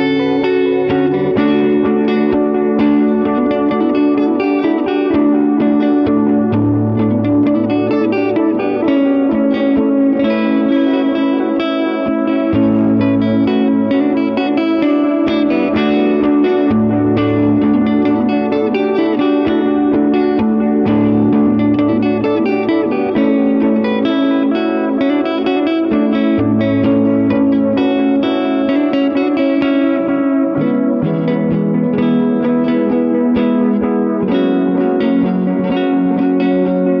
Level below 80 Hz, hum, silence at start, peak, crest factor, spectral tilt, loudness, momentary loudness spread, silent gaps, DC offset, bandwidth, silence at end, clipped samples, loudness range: -46 dBFS; none; 0 s; -2 dBFS; 10 dB; -9.5 dB/octave; -14 LUFS; 2 LU; none; under 0.1%; 5.4 kHz; 0 s; under 0.1%; 1 LU